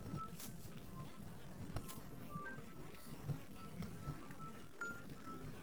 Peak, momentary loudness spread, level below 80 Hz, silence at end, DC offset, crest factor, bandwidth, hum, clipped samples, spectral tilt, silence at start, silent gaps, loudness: -28 dBFS; 6 LU; -62 dBFS; 0 s; 0.2%; 22 dB; over 20 kHz; none; under 0.1%; -5.5 dB/octave; 0 s; none; -51 LUFS